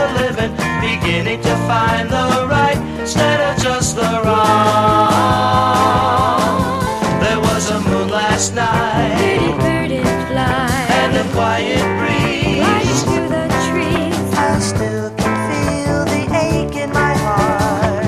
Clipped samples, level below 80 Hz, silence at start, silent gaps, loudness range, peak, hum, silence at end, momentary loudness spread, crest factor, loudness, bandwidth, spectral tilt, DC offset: under 0.1%; -34 dBFS; 0 s; none; 3 LU; 0 dBFS; none; 0 s; 5 LU; 14 dB; -15 LUFS; 15 kHz; -5 dB/octave; under 0.1%